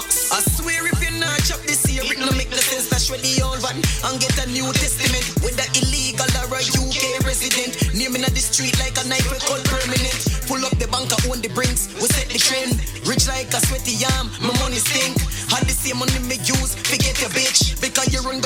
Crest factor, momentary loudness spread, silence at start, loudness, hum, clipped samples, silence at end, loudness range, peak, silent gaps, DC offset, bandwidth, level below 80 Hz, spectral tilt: 20 dB; 4 LU; 0 s; -19 LUFS; none; under 0.1%; 0 s; 1 LU; 0 dBFS; none; under 0.1%; 17.5 kHz; -28 dBFS; -2.5 dB/octave